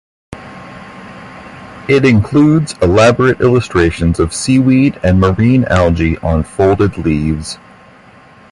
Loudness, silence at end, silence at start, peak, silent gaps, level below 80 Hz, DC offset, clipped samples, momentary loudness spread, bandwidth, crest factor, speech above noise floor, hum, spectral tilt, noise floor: -12 LUFS; 0.95 s; 0.3 s; 0 dBFS; none; -28 dBFS; under 0.1%; under 0.1%; 22 LU; 11.5 kHz; 12 dB; 30 dB; none; -6.5 dB/octave; -41 dBFS